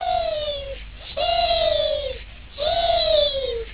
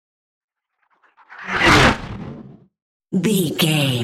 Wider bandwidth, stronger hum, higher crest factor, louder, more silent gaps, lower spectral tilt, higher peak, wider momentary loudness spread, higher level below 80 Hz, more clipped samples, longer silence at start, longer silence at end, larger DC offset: second, 4 kHz vs 16 kHz; neither; second, 14 dB vs 20 dB; second, -21 LUFS vs -16 LUFS; second, none vs 2.82-3.00 s; first, -7 dB/octave vs -4.5 dB/octave; second, -8 dBFS vs -2 dBFS; second, 17 LU vs 21 LU; about the same, -38 dBFS vs -38 dBFS; neither; second, 0 s vs 1.3 s; about the same, 0 s vs 0 s; first, 0.3% vs under 0.1%